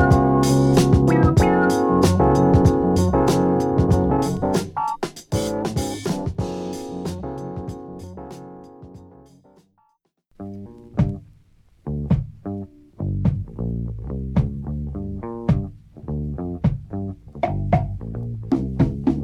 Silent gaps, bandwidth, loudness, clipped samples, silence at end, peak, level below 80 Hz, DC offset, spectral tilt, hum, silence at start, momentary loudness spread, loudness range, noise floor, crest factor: none; 16.5 kHz; -21 LUFS; under 0.1%; 0 s; -2 dBFS; -34 dBFS; under 0.1%; -7 dB/octave; none; 0 s; 20 LU; 15 LU; -66 dBFS; 18 dB